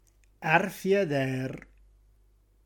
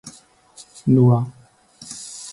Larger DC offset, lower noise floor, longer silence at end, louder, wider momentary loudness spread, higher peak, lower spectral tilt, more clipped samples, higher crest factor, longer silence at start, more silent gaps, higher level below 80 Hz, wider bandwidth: neither; first, -63 dBFS vs -49 dBFS; first, 1.05 s vs 0 s; second, -28 LUFS vs -18 LUFS; second, 12 LU vs 21 LU; second, -8 dBFS vs -4 dBFS; second, -6 dB/octave vs -7.5 dB/octave; neither; about the same, 22 dB vs 18 dB; first, 0.4 s vs 0.05 s; neither; about the same, -60 dBFS vs -58 dBFS; first, 17.5 kHz vs 11.5 kHz